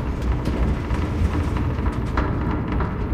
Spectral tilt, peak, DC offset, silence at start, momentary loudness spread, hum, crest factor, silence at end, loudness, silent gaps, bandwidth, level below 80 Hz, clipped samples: -8 dB/octave; -8 dBFS; under 0.1%; 0 s; 2 LU; none; 14 dB; 0 s; -24 LUFS; none; 10 kHz; -26 dBFS; under 0.1%